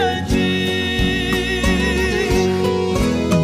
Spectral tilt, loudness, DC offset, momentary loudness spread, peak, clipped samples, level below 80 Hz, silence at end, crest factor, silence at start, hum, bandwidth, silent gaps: -5 dB/octave; -18 LUFS; under 0.1%; 1 LU; -4 dBFS; under 0.1%; -28 dBFS; 0 s; 12 dB; 0 s; none; 16 kHz; none